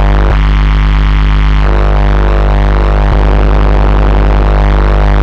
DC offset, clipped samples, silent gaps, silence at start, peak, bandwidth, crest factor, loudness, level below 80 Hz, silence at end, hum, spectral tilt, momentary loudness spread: under 0.1%; under 0.1%; none; 0 s; 0 dBFS; 5.6 kHz; 6 dB; -10 LUFS; -8 dBFS; 0 s; 50 Hz at -10 dBFS; -8 dB/octave; 1 LU